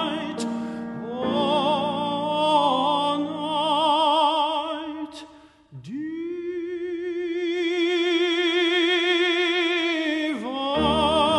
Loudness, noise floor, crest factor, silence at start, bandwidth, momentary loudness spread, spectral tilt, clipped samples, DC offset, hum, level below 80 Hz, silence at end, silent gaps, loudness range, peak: -23 LUFS; -49 dBFS; 16 dB; 0 s; 11.5 kHz; 12 LU; -4.5 dB/octave; under 0.1%; under 0.1%; none; -52 dBFS; 0 s; none; 6 LU; -8 dBFS